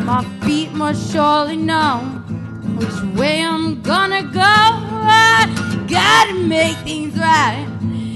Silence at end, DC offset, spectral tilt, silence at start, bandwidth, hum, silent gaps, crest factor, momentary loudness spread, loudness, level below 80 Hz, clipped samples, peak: 0 s; under 0.1%; -4 dB/octave; 0 s; 15 kHz; none; none; 14 dB; 13 LU; -15 LUFS; -46 dBFS; under 0.1%; -2 dBFS